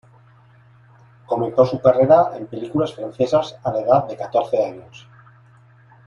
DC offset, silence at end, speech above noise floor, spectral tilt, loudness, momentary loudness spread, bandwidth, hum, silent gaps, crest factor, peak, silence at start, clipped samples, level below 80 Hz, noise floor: under 0.1%; 1.1 s; 32 dB; -7.5 dB/octave; -19 LUFS; 11 LU; 7.2 kHz; none; none; 18 dB; -2 dBFS; 1.3 s; under 0.1%; -58 dBFS; -50 dBFS